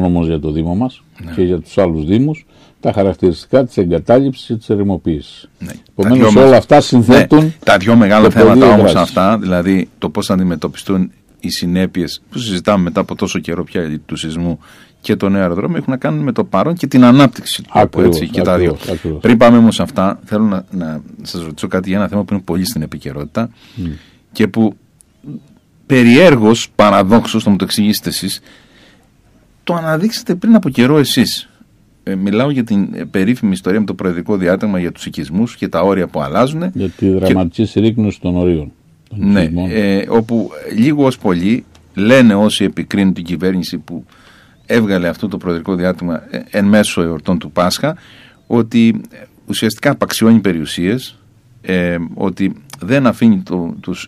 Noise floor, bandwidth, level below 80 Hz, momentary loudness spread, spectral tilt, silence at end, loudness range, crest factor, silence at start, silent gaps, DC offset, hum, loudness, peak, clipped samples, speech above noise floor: -49 dBFS; 15 kHz; -40 dBFS; 15 LU; -6 dB/octave; 0 s; 8 LU; 12 dB; 0 s; none; under 0.1%; none; -13 LUFS; 0 dBFS; under 0.1%; 37 dB